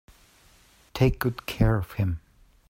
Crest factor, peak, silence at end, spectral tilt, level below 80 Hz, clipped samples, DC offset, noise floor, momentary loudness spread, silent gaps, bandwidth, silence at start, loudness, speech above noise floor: 20 dB; -8 dBFS; 0.55 s; -7 dB/octave; -38 dBFS; under 0.1%; under 0.1%; -58 dBFS; 10 LU; none; 16 kHz; 0.95 s; -26 LUFS; 34 dB